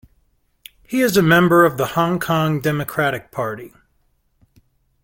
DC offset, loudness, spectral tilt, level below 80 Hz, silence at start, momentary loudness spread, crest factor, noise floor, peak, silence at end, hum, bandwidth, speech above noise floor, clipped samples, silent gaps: under 0.1%; -17 LUFS; -5.5 dB/octave; -52 dBFS; 0.9 s; 13 LU; 18 dB; -63 dBFS; -2 dBFS; 1.35 s; none; 17 kHz; 46 dB; under 0.1%; none